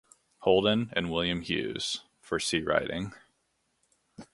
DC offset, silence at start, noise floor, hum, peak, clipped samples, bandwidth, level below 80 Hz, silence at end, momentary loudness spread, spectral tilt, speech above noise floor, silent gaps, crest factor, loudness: under 0.1%; 0.4 s; -75 dBFS; none; -8 dBFS; under 0.1%; 11.5 kHz; -56 dBFS; 0.1 s; 11 LU; -4 dB/octave; 47 dB; none; 22 dB; -29 LUFS